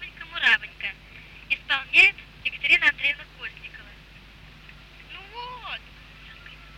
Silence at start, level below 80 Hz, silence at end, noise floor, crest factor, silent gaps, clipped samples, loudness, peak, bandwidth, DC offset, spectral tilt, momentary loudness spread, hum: 0 s; -52 dBFS; 0.1 s; -48 dBFS; 22 dB; none; under 0.1%; -21 LUFS; -4 dBFS; 16 kHz; under 0.1%; -1.5 dB/octave; 26 LU; none